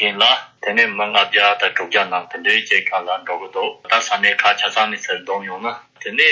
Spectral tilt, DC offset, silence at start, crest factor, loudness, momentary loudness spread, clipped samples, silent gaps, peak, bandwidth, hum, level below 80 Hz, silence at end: -1 dB/octave; under 0.1%; 0 s; 16 dB; -17 LUFS; 10 LU; under 0.1%; none; -2 dBFS; 8 kHz; none; -68 dBFS; 0 s